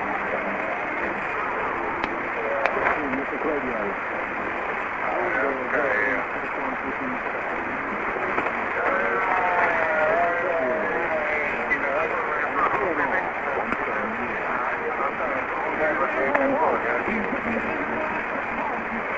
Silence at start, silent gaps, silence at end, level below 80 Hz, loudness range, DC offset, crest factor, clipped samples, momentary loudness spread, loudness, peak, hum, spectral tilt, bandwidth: 0 s; none; 0 s; -52 dBFS; 3 LU; under 0.1%; 22 dB; under 0.1%; 6 LU; -24 LUFS; -2 dBFS; none; -6 dB/octave; 7.8 kHz